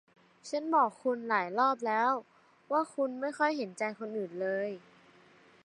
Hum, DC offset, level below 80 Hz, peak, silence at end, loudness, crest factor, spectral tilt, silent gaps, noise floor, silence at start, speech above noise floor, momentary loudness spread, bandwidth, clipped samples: none; under 0.1%; -88 dBFS; -14 dBFS; 0.85 s; -32 LUFS; 18 dB; -5 dB/octave; none; -61 dBFS; 0.45 s; 29 dB; 10 LU; 11 kHz; under 0.1%